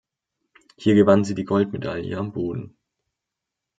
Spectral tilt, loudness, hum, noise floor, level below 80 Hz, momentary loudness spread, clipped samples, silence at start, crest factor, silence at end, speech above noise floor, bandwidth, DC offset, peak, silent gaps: -7.5 dB/octave; -21 LUFS; none; -84 dBFS; -62 dBFS; 13 LU; under 0.1%; 0.8 s; 22 dB; 1.1 s; 64 dB; 9 kHz; under 0.1%; -2 dBFS; none